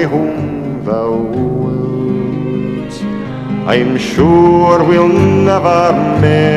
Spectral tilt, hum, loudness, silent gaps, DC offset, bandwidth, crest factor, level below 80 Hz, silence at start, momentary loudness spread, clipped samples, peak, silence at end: -7.5 dB/octave; none; -12 LUFS; none; under 0.1%; 11 kHz; 12 dB; -38 dBFS; 0 s; 12 LU; 0.1%; 0 dBFS; 0 s